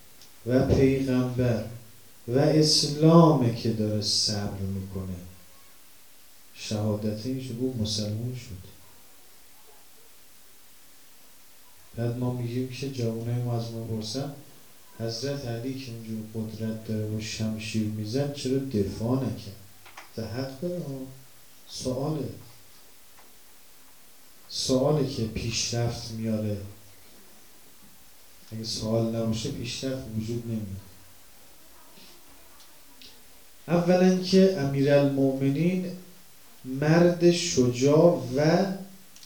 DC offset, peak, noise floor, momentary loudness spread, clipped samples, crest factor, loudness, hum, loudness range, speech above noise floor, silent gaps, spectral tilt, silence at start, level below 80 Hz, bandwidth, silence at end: 0.3%; -4 dBFS; -55 dBFS; 19 LU; under 0.1%; 24 dB; -26 LUFS; none; 13 LU; 29 dB; none; -5.5 dB/octave; 0.2 s; -54 dBFS; over 20 kHz; 0.3 s